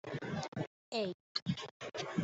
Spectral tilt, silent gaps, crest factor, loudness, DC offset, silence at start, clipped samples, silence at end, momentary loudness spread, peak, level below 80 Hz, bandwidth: -5.5 dB/octave; 0.48-0.52 s, 0.67-0.92 s, 1.14-1.35 s, 1.42-1.46 s, 1.71-1.80 s; 22 dB; -41 LUFS; under 0.1%; 0.05 s; under 0.1%; 0 s; 5 LU; -18 dBFS; -74 dBFS; 8.2 kHz